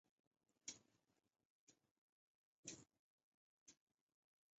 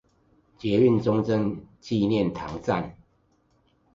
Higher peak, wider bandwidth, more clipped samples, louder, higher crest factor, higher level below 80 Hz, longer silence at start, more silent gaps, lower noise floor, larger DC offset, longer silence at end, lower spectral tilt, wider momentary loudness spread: second, -38 dBFS vs -8 dBFS; about the same, 8 kHz vs 7.6 kHz; neither; second, -59 LUFS vs -25 LUFS; first, 30 dB vs 18 dB; second, under -90 dBFS vs -54 dBFS; about the same, 0.65 s vs 0.65 s; first, 1.45-1.67 s, 1.91-2.63 s, 2.99-3.66 s vs none; first, -86 dBFS vs -66 dBFS; neither; second, 0.85 s vs 1.05 s; second, -2.5 dB/octave vs -8 dB/octave; second, 6 LU vs 12 LU